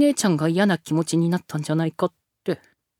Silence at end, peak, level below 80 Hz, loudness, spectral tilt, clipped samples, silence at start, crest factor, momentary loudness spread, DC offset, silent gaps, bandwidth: 0.45 s; -8 dBFS; -68 dBFS; -23 LUFS; -5.5 dB/octave; under 0.1%; 0 s; 16 dB; 10 LU; under 0.1%; none; 16 kHz